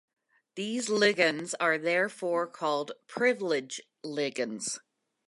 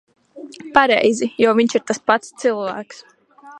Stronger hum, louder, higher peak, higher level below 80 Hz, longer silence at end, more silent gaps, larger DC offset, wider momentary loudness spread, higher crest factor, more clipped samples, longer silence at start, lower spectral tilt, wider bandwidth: neither; second, -29 LUFS vs -17 LUFS; second, -10 dBFS vs 0 dBFS; second, -84 dBFS vs -60 dBFS; first, 0.5 s vs 0 s; neither; neither; second, 13 LU vs 19 LU; about the same, 20 dB vs 18 dB; neither; first, 0.55 s vs 0.35 s; about the same, -3 dB/octave vs -3.5 dB/octave; about the same, 11.5 kHz vs 11 kHz